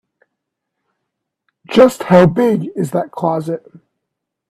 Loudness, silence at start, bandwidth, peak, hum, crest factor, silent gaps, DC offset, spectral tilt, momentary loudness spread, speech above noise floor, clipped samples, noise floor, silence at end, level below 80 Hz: -14 LUFS; 1.7 s; 14 kHz; 0 dBFS; none; 16 dB; none; under 0.1%; -7 dB/octave; 11 LU; 65 dB; under 0.1%; -78 dBFS; 0.9 s; -54 dBFS